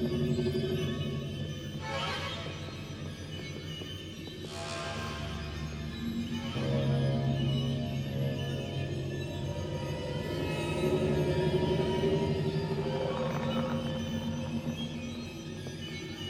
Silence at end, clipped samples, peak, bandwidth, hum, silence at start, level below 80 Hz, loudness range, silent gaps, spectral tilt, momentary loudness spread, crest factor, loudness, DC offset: 0 s; under 0.1%; -16 dBFS; 13.5 kHz; none; 0 s; -50 dBFS; 7 LU; none; -6.5 dB/octave; 11 LU; 16 dB; -34 LUFS; under 0.1%